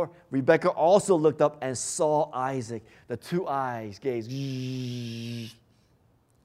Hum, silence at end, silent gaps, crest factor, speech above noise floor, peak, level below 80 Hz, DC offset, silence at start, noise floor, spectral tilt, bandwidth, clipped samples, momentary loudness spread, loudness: none; 0.95 s; none; 22 dB; 37 dB; -6 dBFS; -68 dBFS; under 0.1%; 0 s; -64 dBFS; -5.5 dB/octave; 15 kHz; under 0.1%; 16 LU; -27 LUFS